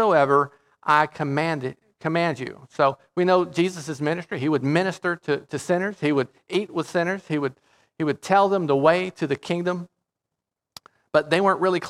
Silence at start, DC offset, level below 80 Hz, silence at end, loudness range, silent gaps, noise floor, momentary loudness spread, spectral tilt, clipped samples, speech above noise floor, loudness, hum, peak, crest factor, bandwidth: 0 s; under 0.1%; -70 dBFS; 0 s; 2 LU; none; -85 dBFS; 9 LU; -6 dB/octave; under 0.1%; 62 dB; -23 LUFS; none; -2 dBFS; 20 dB; 13 kHz